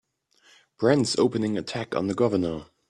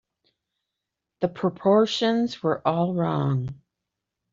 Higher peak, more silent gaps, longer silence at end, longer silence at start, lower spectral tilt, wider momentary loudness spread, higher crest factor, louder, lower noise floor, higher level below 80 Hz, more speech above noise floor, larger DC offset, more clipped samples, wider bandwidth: about the same, -6 dBFS vs -6 dBFS; neither; second, 0.25 s vs 0.8 s; second, 0.8 s vs 1.2 s; second, -5.5 dB/octave vs -7 dB/octave; about the same, 8 LU vs 9 LU; about the same, 20 dB vs 20 dB; about the same, -25 LUFS vs -24 LUFS; second, -62 dBFS vs -84 dBFS; about the same, -60 dBFS vs -64 dBFS; second, 38 dB vs 61 dB; neither; neither; first, 11.5 kHz vs 7.6 kHz